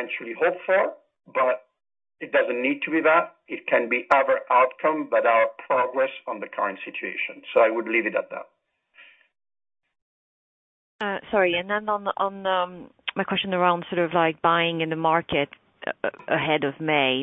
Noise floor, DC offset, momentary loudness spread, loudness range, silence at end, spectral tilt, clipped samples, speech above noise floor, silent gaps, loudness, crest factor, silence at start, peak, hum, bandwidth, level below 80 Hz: -57 dBFS; under 0.1%; 11 LU; 7 LU; 0 s; -7 dB/octave; under 0.1%; 34 dB; 10.02-10.99 s; -24 LUFS; 20 dB; 0 s; -6 dBFS; none; 4.3 kHz; -66 dBFS